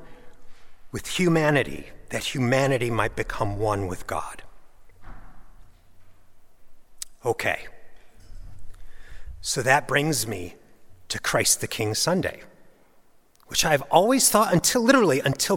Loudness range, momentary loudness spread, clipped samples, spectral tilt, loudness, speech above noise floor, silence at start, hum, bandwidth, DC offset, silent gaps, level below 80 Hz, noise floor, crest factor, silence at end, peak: 12 LU; 15 LU; under 0.1%; -3.5 dB/octave; -23 LUFS; 32 dB; 0 s; none; 17.5 kHz; under 0.1%; none; -46 dBFS; -55 dBFS; 24 dB; 0 s; -2 dBFS